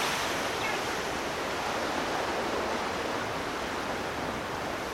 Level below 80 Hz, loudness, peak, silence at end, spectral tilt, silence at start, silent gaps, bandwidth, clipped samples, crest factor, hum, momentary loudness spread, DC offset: -54 dBFS; -31 LUFS; -18 dBFS; 0 s; -3 dB/octave; 0 s; none; 16 kHz; under 0.1%; 14 dB; none; 3 LU; under 0.1%